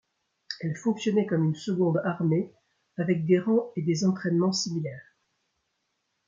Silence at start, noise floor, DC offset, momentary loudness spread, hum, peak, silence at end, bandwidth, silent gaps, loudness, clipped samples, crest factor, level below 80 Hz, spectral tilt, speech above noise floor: 0.5 s; -78 dBFS; under 0.1%; 12 LU; none; -10 dBFS; 1.25 s; 7.6 kHz; none; -27 LUFS; under 0.1%; 18 dB; -72 dBFS; -6.5 dB/octave; 52 dB